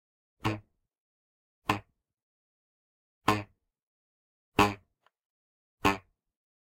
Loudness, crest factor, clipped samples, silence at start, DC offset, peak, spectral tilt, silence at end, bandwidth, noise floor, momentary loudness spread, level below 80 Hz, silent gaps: -31 LUFS; 28 dB; under 0.1%; 0.45 s; under 0.1%; -8 dBFS; -5 dB/octave; 0.7 s; 16 kHz; -66 dBFS; 13 LU; -56 dBFS; 1.00-1.62 s, 2.23-3.21 s, 3.83-4.52 s, 5.26-5.78 s